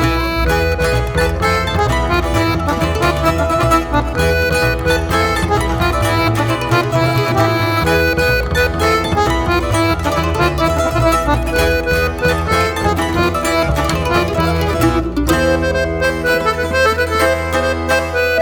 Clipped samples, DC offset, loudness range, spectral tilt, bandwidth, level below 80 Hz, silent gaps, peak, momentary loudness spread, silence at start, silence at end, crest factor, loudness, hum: under 0.1%; under 0.1%; 1 LU; -5.5 dB/octave; 19 kHz; -24 dBFS; none; 0 dBFS; 2 LU; 0 s; 0 s; 14 dB; -15 LUFS; none